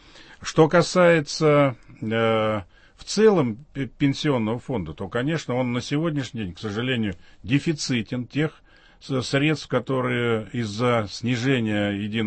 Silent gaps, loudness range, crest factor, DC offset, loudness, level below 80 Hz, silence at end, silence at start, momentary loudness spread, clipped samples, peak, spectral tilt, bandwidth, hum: none; 5 LU; 20 dB; under 0.1%; -23 LUFS; -54 dBFS; 0 s; 0.15 s; 11 LU; under 0.1%; -4 dBFS; -5.5 dB/octave; 8.8 kHz; none